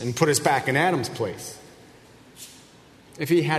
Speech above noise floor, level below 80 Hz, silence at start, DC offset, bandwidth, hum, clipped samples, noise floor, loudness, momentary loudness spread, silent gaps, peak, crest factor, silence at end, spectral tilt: 28 dB; -62 dBFS; 0 s; under 0.1%; 13.5 kHz; none; under 0.1%; -51 dBFS; -23 LUFS; 22 LU; none; -4 dBFS; 22 dB; 0 s; -4.5 dB/octave